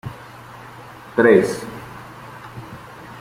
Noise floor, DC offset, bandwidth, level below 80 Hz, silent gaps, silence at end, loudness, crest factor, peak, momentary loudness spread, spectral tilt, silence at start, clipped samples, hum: -39 dBFS; under 0.1%; 16 kHz; -54 dBFS; none; 0 s; -17 LUFS; 20 dB; -2 dBFS; 25 LU; -6 dB/octave; 0.05 s; under 0.1%; none